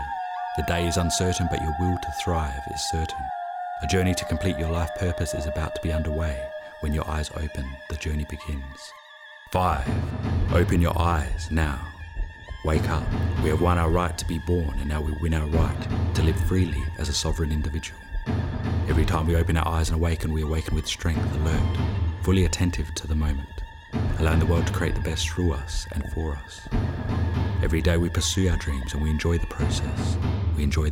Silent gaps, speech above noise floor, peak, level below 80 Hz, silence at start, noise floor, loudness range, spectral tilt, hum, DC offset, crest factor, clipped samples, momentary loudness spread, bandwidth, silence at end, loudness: none; 22 dB; -8 dBFS; -30 dBFS; 0 s; -46 dBFS; 4 LU; -5.5 dB/octave; none; under 0.1%; 16 dB; under 0.1%; 10 LU; 16 kHz; 0 s; -26 LUFS